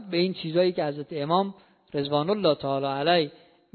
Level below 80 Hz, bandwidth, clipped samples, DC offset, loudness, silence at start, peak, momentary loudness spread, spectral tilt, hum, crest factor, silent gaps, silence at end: -68 dBFS; 4.6 kHz; under 0.1%; under 0.1%; -26 LUFS; 0 s; -8 dBFS; 9 LU; -10.5 dB/octave; none; 18 dB; none; 0.45 s